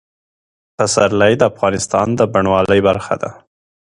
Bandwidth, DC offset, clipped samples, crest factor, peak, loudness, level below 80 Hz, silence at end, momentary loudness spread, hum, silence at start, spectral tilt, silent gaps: 11.5 kHz; under 0.1%; under 0.1%; 16 dB; 0 dBFS; -15 LUFS; -44 dBFS; 0.55 s; 8 LU; none; 0.8 s; -4.5 dB/octave; none